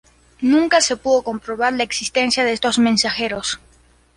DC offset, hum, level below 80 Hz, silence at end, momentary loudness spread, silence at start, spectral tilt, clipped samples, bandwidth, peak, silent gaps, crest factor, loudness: under 0.1%; none; -52 dBFS; 0.6 s; 8 LU; 0.4 s; -2.5 dB/octave; under 0.1%; 11.5 kHz; -4 dBFS; none; 16 dB; -18 LUFS